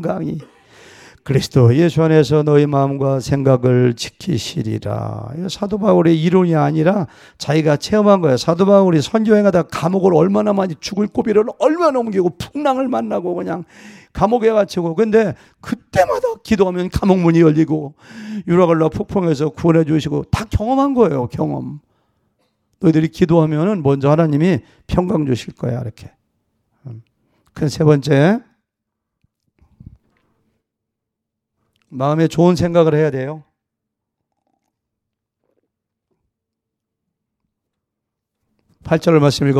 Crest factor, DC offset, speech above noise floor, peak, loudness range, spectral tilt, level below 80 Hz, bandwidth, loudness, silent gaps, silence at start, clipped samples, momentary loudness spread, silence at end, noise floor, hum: 16 dB; under 0.1%; 65 dB; 0 dBFS; 6 LU; -7.5 dB/octave; -42 dBFS; 13.5 kHz; -16 LUFS; none; 0 s; under 0.1%; 12 LU; 0 s; -80 dBFS; none